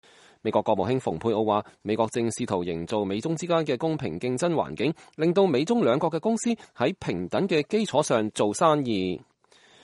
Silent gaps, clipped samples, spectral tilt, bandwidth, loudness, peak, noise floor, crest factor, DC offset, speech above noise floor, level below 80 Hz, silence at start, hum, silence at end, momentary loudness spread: none; under 0.1%; -5.5 dB/octave; 11.5 kHz; -26 LUFS; -6 dBFS; -57 dBFS; 20 dB; under 0.1%; 32 dB; -62 dBFS; 0.45 s; none; 0.65 s; 7 LU